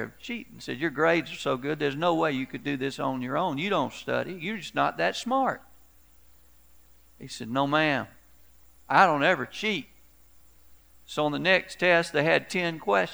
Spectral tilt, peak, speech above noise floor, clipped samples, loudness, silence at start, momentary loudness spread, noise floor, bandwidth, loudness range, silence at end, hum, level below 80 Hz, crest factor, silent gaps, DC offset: -5 dB/octave; -4 dBFS; 32 dB; under 0.1%; -26 LUFS; 0 s; 11 LU; -59 dBFS; over 20 kHz; 5 LU; 0 s; none; -62 dBFS; 24 dB; none; 0.1%